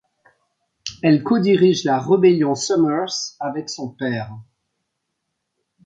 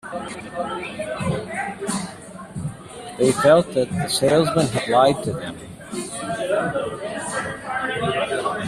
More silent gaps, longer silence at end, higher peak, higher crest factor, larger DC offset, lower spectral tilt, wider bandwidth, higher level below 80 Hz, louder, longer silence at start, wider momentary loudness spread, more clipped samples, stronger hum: neither; first, 1.45 s vs 0 s; about the same, -4 dBFS vs -2 dBFS; about the same, 18 dB vs 20 dB; neither; about the same, -5.5 dB/octave vs -4.5 dB/octave; second, 9.2 kHz vs 14.5 kHz; second, -62 dBFS vs -52 dBFS; first, -18 LUFS vs -22 LUFS; first, 0.85 s vs 0.05 s; about the same, 14 LU vs 15 LU; neither; neither